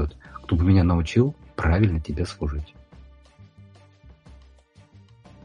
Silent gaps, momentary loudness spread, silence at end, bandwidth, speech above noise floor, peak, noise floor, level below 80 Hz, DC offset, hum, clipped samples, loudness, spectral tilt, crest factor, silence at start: none; 14 LU; 2.45 s; 9.8 kHz; 32 dB; -6 dBFS; -53 dBFS; -34 dBFS; under 0.1%; none; under 0.1%; -23 LUFS; -8 dB/octave; 18 dB; 0 s